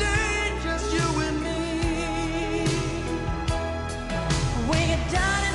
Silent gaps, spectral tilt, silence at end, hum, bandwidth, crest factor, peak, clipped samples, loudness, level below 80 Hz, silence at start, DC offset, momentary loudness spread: none; -4.5 dB/octave; 0 s; none; 11.5 kHz; 14 dB; -10 dBFS; under 0.1%; -26 LUFS; -32 dBFS; 0 s; under 0.1%; 6 LU